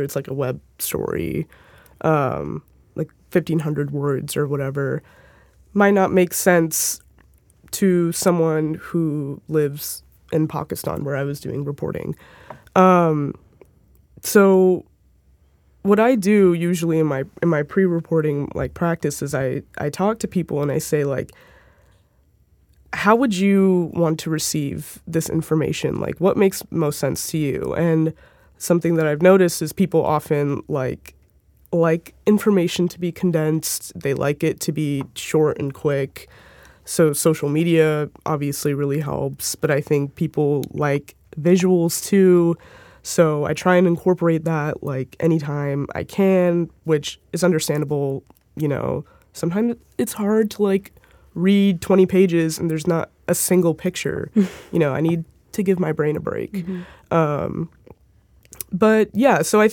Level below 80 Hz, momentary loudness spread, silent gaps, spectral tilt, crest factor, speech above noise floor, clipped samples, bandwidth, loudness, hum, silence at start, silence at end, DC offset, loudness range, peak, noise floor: -54 dBFS; 11 LU; none; -6 dB/octave; 20 dB; 39 dB; under 0.1%; 19 kHz; -20 LUFS; none; 0 s; 0 s; under 0.1%; 5 LU; 0 dBFS; -58 dBFS